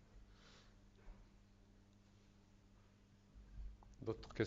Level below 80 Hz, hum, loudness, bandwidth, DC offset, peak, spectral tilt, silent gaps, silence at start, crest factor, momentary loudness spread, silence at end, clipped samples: -62 dBFS; 50 Hz at -70 dBFS; -56 LUFS; 7.6 kHz; under 0.1%; -24 dBFS; -6 dB/octave; none; 0 s; 28 dB; 21 LU; 0 s; under 0.1%